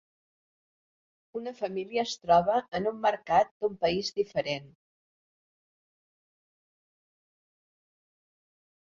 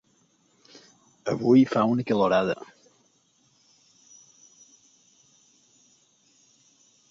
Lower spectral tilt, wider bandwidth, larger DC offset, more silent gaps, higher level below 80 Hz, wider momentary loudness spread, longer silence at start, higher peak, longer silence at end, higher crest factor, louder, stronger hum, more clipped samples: second, -4.5 dB/octave vs -7 dB/octave; about the same, 7.6 kHz vs 7.6 kHz; neither; first, 3.51-3.60 s vs none; about the same, -64 dBFS vs -66 dBFS; second, 12 LU vs 16 LU; about the same, 1.35 s vs 1.25 s; second, -12 dBFS vs -8 dBFS; second, 4.2 s vs 4.45 s; about the same, 22 dB vs 20 dB; second, -29 LUFS vs -23 LUFS; neither; neither